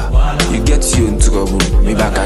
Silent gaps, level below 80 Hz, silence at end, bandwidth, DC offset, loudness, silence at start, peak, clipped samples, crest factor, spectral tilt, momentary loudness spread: none; -14 dBFS; 0 s; 12.5 kHz; under 0.1%; -14 LUFS; 0 s; 0 dBFS; under 0.1%; 12 dB; -4.5 dB/octave; 2 LU